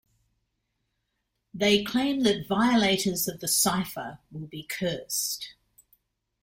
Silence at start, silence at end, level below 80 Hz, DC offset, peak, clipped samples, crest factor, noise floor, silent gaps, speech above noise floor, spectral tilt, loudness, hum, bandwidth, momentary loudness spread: 1.55 s; 0.9 s; -60 dBFS; under 0.1%; -10 dBFS; under 0.1%; 20 dB; -79 dBFS; none; 53 dB; -3 dB/octave; -25 LUFS; none; 16.5 kHz; 17 LU